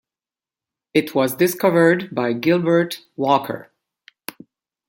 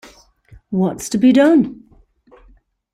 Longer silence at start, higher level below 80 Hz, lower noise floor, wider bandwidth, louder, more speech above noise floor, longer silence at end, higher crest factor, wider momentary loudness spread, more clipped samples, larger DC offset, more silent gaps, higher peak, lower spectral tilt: first, 0.95 s vs 0.7 s; second, -66 dBFS vs -52 dBFS; first, under -90 dBFS vs -51 dBFS; first, 17 kHz vs 14 kHz; second, -19 LUFS vs -15 LUFS; first, over 72 dB vs 38 dB; about the same, 1.25 s vs 1.2 s; about the same, 18 dB vs 16 dB; first, 19 LU vs 12 LU; neither; neither; neither; about the same, -2 dBFS vs -2 dBFS; about the same, -5.5 dB/octave vs -6 dB/octave